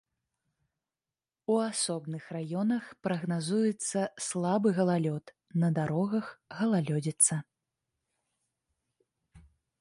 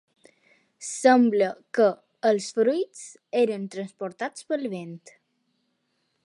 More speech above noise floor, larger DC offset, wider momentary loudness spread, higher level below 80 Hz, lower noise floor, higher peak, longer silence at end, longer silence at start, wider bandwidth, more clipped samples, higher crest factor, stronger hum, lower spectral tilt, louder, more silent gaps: first, over 60 dB vs 50 dB; neither; second, 11 LU vs 17 LU; first, -72 dBFS vs -82 dBFS; first, under -90 dBFS vs -74 dBFS; second, -10 dBFS vs -6 dBFS; second, 0.4 s vs 1.25 s; first, 1.5 s vs 0.8 s; about the same, 11.5 kHz vs 11.5 kHz; neither; about the same, 22 dB vs 20 dB; neither; about the same, -5 dB/octave vs -4.5 dB/octave; second, -30 LUFS vs -25 LUFS; neither